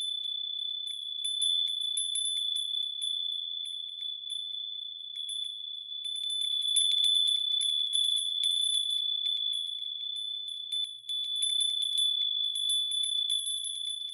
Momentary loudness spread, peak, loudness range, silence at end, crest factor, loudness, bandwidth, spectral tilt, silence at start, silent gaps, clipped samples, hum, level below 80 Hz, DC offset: 10 LU; -14 dBFS; 7 LU; 0 s; 16 dB; -28 LUFS; 12 kHz; 6.5 dB/octave; 0 s; none; under 0.1%; none; under -90 dBFS; under 0.1%